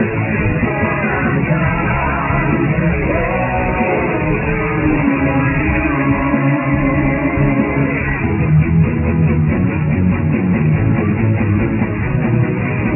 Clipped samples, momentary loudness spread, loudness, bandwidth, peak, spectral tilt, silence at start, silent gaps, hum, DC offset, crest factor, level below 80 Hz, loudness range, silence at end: under 0.1%; 2 LU; -15 LUFS; 3 kHz; -2 dBFS; -12 dB/octave; 0 s; none; none; under 0.1%; 14 dB; -26 dBFS; 1 LU; 0 s